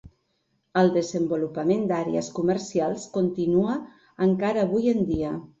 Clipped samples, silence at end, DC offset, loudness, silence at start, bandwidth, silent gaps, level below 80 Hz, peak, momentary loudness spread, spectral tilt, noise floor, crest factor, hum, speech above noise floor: under 0.1%; 0.15 s; under 0.1%; -25 LUFS; 0.05 s; 8 kHz; none; -52 dBFS; -8 dBFS; 6 LU; -7 dB/octave; -72 dBFS; 18 dB; none; 48 dB